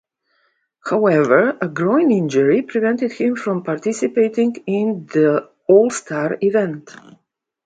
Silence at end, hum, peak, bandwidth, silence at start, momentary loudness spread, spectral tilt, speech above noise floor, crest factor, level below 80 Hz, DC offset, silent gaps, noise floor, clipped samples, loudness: 0.75 s; none; 0 dBFS; 9.4 kHz; 0.85 s; 8 LU; -6.5 dB/octave; 48 dB; 18 dB; -66 dBFS; under 0.1%; none; -65 dBFS; under 0.1%; -17 LUFS